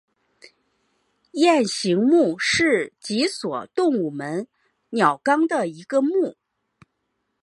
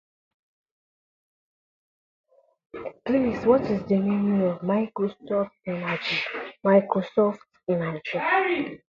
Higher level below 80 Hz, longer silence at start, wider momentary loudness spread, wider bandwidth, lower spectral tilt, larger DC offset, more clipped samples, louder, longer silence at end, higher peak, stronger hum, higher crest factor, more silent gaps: second, -66 dBFS vs -60 dBFS; second, 1.35 s vs 2.75 s; about the same, 11 LU vs 10 LU; first, 11.5 kHz vs 7 kHz; second, -4 dB/octave vs -8 dB/octave; neither; neither; first, -21 LUFS vs -25 LUFS; first, 1.1 s vs 0.15 s; about the same, -4 dBFS vs -6 dBFS; neither; about the same, 20 dB vs 20 dB; neither